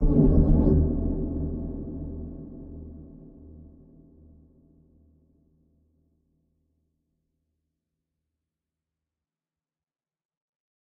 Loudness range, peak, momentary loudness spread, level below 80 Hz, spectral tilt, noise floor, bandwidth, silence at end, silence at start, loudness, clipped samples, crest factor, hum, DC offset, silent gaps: 26 LU; -6 dBFS; 27 LU; -32 dBFS; -14 dB/octave; under -90 dBFS; 1.8 kHz; 7.15 s; 0 s; -25 LUFS; under 0.1%; 22 dB; none; under 0.1%; none